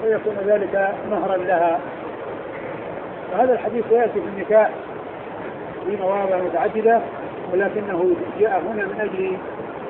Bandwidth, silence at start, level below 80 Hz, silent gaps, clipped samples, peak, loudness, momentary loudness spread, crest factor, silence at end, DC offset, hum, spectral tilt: 4.1 kHz; 0 s; -58 dBFS; none; under 0.1%; -4 dBFS; -22 LUFS; 13 LU; 16 dB; 0 s; under 0.1%; none; -10.5 dB/octave